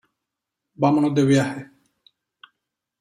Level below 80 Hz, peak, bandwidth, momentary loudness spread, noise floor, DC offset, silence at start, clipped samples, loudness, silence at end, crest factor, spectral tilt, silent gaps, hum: -64 dBFS; -6 dBFS; 10.5 kHz; 10 LU; -83 dBFS; under 0.1%; 0.8 s; under 0.1%; -20 LUFS; 1.35 s; 18 dB; -7 dB/octave; none; none